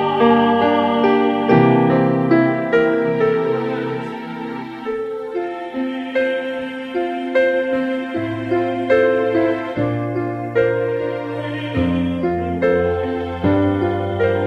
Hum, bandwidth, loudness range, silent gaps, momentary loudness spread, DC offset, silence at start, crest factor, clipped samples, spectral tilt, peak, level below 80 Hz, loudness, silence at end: none; 8.6 kHz; 7 LU; none; 10 LU; under 0.1%; 0 s; 16 dB; under 0.1%; -8.5 dB/octave; 0 dBFS; -48 dBFS; -18 LUFS; 0 s